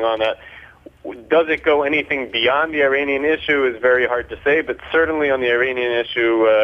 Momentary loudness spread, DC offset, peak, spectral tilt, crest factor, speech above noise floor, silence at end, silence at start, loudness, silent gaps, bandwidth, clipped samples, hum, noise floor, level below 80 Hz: 5 LU; under 0.1%; -2 dBFS; -6 dB/octave; 16 dB; 25 dB; 0 s; 0 s; -18 LUFS; none; 6.2 kHz; under 0.1%; none; -42 dBFS; -50 dBFS